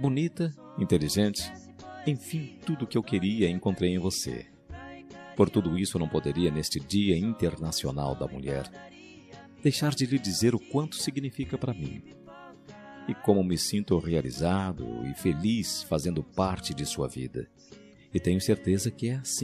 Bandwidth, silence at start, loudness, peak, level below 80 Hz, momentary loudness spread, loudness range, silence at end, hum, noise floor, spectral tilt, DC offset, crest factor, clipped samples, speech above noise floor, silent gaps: 14.5 kHz; 0 s; -29 LUFS; -8 dBFS; -54 dBFS; 19 LU; 3 LU; 0 s; none; -49 dBFS; -5.5 dB/octave; under 0.1%; 22 dB; under 0.1%; 21 dB; none